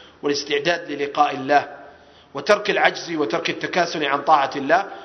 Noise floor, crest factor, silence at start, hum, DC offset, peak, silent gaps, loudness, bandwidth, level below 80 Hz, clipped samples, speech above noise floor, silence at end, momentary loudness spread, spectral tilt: -47 dBFS; 22 dB; 0 s; none; under 0.1%; 0 dBFS; none; -20 LUFS; 11 kHz; -64 dBFS; under 0.1%; 26 dB; 0 s; 7 LU; -3.5 dB/octave